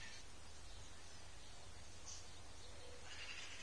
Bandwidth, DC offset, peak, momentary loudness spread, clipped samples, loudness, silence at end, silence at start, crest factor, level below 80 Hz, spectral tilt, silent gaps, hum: 11 kHz; 0.2%; -40 dBFS; 7 LU; under 0.1%; -55 LUFS; 0 s; 0 s; 18 dB; -64 dBFS; -2 dB/octave; none; none